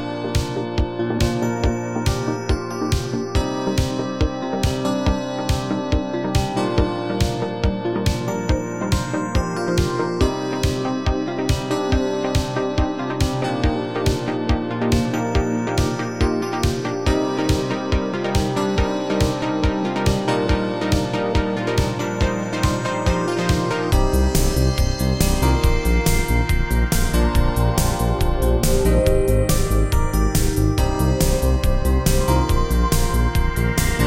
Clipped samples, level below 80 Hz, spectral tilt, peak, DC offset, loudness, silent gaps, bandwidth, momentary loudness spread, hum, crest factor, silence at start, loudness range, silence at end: under 0.1%; -24 dBFS; -5.5 dB/octave; -2 dBFS; 0.5%; -21 LUFS; none; 17 kHz; 4 LU; none; 16 dB; 0 s; 3 LU; 0 s